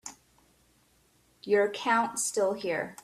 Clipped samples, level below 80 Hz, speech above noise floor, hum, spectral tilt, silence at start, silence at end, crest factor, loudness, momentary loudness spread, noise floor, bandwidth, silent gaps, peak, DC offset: under 0.1%; -72 dBFS; 38 dB; none; -2.5 dB/octave; 0.05 s; 0.1 s; 18 dB; -28 LUFS; 12 LU; -66 dBFS; 15 kHz; none; -12 dBFS; under 0.1%